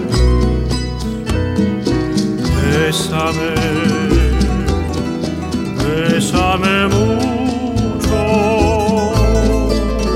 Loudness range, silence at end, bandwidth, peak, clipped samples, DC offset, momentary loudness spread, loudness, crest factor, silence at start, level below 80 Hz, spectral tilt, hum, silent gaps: 2 LU; 0 s; 15.5 kHz; 0 dBFS; under 0.1%; under 0.1%; 6 LU; -15 LUFS; 14 dB; 0 s; -22 dBFS; -6 dB/octave; none; none